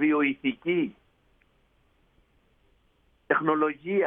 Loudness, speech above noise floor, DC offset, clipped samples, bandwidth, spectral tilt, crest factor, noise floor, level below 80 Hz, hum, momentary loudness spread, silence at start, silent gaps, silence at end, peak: -27 LUFS; 41 dB; under 0.1%; under 0.1%; 3.8 kHz; -9 dB/octave; 20 dB; -66 dBFS; -68 dBFS; none; 5 LU; 0 s; none; 0 s; -8 dBFS